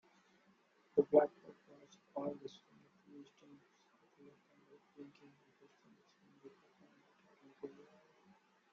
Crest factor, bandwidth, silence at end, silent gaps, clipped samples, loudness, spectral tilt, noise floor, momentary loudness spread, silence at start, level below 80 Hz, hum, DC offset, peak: 28 dB; 7 kHz; 1.05 s; none; under 0.1%; -37 LUFS; -6 dB/octave; -73 dBFS; 31 LU; 0.95 s; -88 dBFS; none; under 0.1%; -16 dBFS